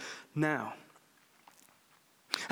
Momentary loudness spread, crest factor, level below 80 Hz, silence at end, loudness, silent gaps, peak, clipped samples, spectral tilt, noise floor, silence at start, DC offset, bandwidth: 12 LU; 30 dB; -84 dBFS; 0 s; -35 LUFS; none; -10 dBFS; under 0.1%; -4.5 dB/octave; -67 dBFS; 0 s; under 0.1%; over 20 kHz